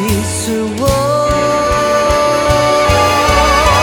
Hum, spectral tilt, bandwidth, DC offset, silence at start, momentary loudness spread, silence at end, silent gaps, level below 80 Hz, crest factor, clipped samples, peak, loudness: none; -4 dB/octave; over 20 kHz; under 0.1%; 0 s; 6 LU; 0 s; none; -24 dBFS; 12 dB; under 0.1%; 0 dBFS; -12 LUFS